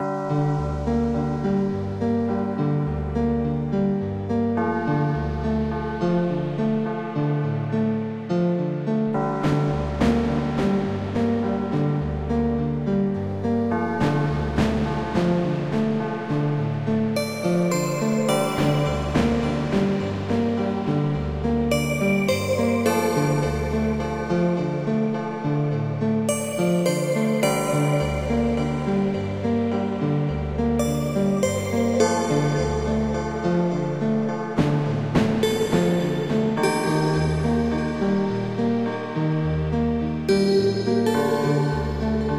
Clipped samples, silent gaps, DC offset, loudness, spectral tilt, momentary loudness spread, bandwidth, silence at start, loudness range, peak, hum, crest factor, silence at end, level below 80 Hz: under 0.1%; none; 0.2%; -23 LUFS; -6.5 dB/octave; 4 LU; 16 kHz; 0 s; 2 LU; -6 dBFS; none; 16 dB; 0 s; -38 dBFS